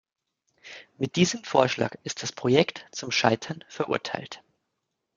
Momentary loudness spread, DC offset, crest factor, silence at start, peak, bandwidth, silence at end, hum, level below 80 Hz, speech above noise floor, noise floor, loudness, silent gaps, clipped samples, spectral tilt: 20 LU; under 0.1%; 26 dB; 0.65 s; -2 dBFS; 9.2 kHz; 0.8 s; none; -68 dBFS; 55 dB; -81 dBFS; -26 LUFS; none; under 0.1%; -4.5 dB/octave